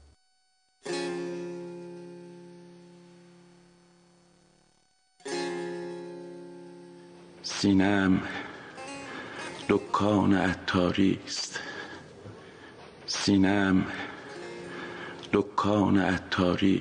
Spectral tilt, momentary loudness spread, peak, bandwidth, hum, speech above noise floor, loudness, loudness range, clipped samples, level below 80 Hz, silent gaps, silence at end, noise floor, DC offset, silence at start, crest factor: -5.5 dB/octave; 23 LU; -10 dBFS; 10 kHz; none; 46 dB; -28 LUFS; 13 LU; under 0.1%; -64 dBFS; none; 0 s; -71 dBFS; under 0.1%; 0.85 s; 20 dB